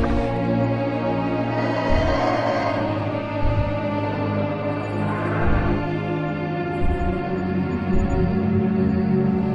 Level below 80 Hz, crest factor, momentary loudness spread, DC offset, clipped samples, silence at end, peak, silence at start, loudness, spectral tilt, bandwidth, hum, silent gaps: -32 dBFS; 14 dB; 5 LU; under 0.1%; under 0.1%; 0 s; -8 dBFS; 0 s; -23 LUFS; -8.5 dB/octave; 8 kHz; none; none